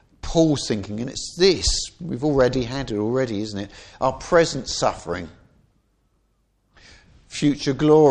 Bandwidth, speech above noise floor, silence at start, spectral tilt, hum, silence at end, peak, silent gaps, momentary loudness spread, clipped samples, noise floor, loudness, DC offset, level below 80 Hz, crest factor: 10.5 kHz; 46 dB; 0.25 s; -5 dB/octave; none; 0 s; -4 dBFS; none; 13 LU; under 0.1%; -66 dBFS; -22 LUFS; under 0.1%; -40 dBFS; 18 dB